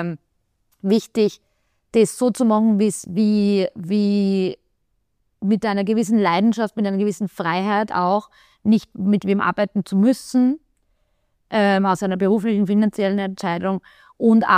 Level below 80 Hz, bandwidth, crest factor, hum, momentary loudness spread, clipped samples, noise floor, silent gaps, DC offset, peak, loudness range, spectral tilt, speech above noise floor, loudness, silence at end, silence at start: -62 dBFS; 14.5 kHz; 18 dB; none; 7 LU; under 0.1%; -71 dBFS; none; under 0.1%; -2 dBFS; 2 LU; -6.5 dB/octave; 52 dB; -20 LUFS; 0 s; 0 s